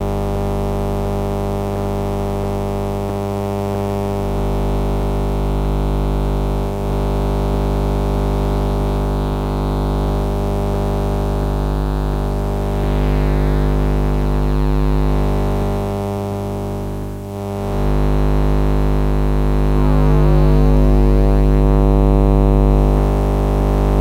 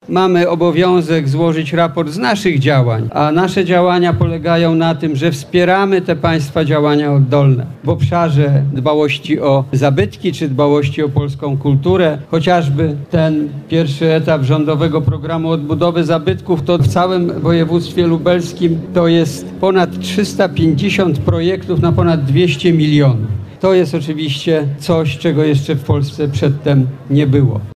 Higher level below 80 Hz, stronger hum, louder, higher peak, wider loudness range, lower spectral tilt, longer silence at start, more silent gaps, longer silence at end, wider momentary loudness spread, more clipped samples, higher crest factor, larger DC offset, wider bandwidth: first, -18 dBFS vs -42 dBFS; first, 50 Hz at -20 dBFS vs none; second, -18 LUFS vs -14 LUFS; about the same, 0 dBFS vs -2 dBFS; first, 6 LU vs 2 LU; about the same, -8 dB/octave vs -7.5 dB/octave; about the same, 0 s vs 0.1 s; neither; about the same, 0 s vs 0.05 s; about the same, 7 LU vs 5 LU; neither; about the same, 14 dB vs 10 dB; neither; first, 15 kHz vs 13.5 kHz